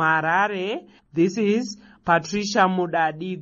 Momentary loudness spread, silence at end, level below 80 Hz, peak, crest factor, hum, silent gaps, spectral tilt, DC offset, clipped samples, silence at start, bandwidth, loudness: 12 LU; 0 s; -60 dBFS; -4 dBFS; 18 dB; none; none; -5 dB/octave; under 0.1%; under 0.1%; 0 s; 7.8 kHz; -22 LUFS